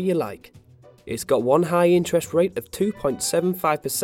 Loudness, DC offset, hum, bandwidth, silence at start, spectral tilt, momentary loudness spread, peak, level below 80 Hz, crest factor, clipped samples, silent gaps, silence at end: -22 LUFS; under 0.1%; none; 17 kHz; 0 s; -5 dB/octave; 12 LU; -6 dBFS; -56 dBFS; 18 dB; under 0.1%; none; 0 s